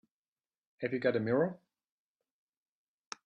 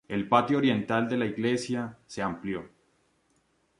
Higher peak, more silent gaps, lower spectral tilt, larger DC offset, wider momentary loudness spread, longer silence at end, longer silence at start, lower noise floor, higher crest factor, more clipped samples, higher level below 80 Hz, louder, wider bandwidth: second, -16 dBFS vs -8 dBFS; neither; about the same, -6.5 dB/octave vs -6 dB/octave; neither; about the same, 10 LU vs 11 LU; first, 1.7 s vs 1.15 s; first, 0.8 s vs 0.1 s; first, under -90 dBFS vs -70 dBFS; about the same, 20 dB vs 22 dB; neither; second, -78 dBFS vs -64 dBFS; second, -33 LUFS vs -28 LUFS; second, 8.4 kHz vs 11.5 kHz